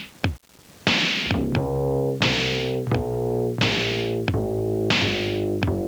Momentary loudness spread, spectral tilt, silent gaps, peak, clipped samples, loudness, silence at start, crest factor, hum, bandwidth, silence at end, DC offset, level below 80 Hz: 5 LU; -5 dB/octave; none; -4 dBFS; under 0.1%; -23 LUFS; 0 s; 20 dB; none; over 20 kHz; 0 s; under 0.1%; -42 dBFS